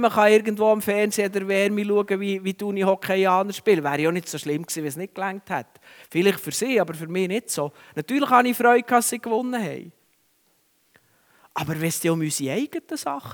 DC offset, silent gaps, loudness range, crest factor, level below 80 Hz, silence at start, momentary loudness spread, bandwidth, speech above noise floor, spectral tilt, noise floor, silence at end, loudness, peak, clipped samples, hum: under 0.1%; none; 7 LU; 20 dB; -70 dBFS; 0 s; 12 LU; over 20 kHz; 42 dB; -4.5 dB/octave; -65 dBFS; 0 s; -23 LUFS; -2 dBFS; under 0.1%; none